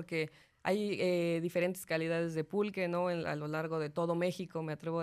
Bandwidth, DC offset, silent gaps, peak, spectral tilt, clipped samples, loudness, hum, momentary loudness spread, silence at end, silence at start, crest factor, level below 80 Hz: 14.5 kHz; under 0.1%; none; -18 dBFS; -6 dB/octave; under 0.1%; -35 LUFS; none; 6 LU; 0 s; 0 s; 16 dB; -74 dBFS